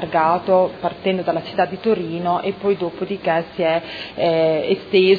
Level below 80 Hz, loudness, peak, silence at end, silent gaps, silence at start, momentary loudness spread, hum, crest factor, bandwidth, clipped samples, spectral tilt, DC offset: -56 dBFS; -20 LUFS; -2 dBFS; 0 s; none; 0 s; 6 LU; none; 16 dB; 5 kHz; under 0.1%; -8 dB/octave; under 0.1%